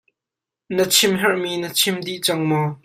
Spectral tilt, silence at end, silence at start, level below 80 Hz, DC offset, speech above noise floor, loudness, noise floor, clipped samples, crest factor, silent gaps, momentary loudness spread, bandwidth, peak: -3 dB/octave; 0.1 s; 0.7 s; -64 dBFS; under 0.1%; 67 dB; -19 LUFS; -87 dBFS; under 0.1%; 18 dB; none; 7 LU; 16 kHz; -2 dBFS